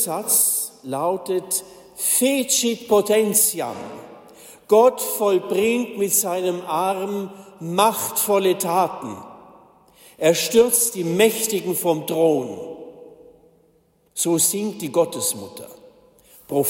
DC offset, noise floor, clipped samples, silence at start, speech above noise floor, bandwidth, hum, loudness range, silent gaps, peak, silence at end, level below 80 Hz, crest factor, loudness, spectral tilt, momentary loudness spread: under 0.1%; -60 dBFS; under 0.1%; 0 s; 40 dB; 16.5 kHz; none; 4 LU; none; -4 dBFS; 0 s; -66 dBFS; 18 dB; -20 LUFS; -3 dB/octave; 17 LU